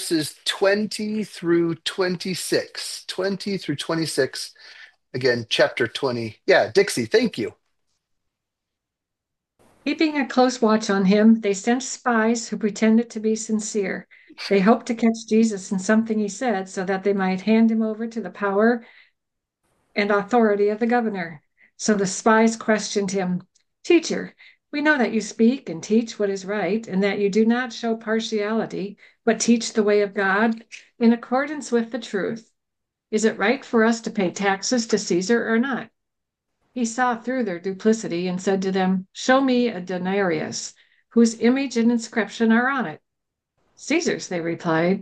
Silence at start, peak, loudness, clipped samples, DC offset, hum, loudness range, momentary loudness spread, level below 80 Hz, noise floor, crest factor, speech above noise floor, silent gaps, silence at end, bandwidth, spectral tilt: 0 s; -4 dBFS; -22 LUFS; under 0.1%; under 0.1%; none; 3 LU; 9 LU; -70 dBFS; -84 dBFS; 18 dB; 62 dB; none; 0 s; 12.5 kHz; -4.5 dB/octave